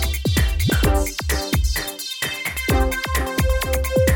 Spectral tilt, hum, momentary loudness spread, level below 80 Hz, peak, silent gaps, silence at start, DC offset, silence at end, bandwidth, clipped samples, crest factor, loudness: -4.5 dB/octave; none; 5 LU; -24 dBFS; -4 dBFS; none; 0 s; under 0.1%; 0 s; over 20 kHz; under 0.1%; 16 dB; -21 LUFS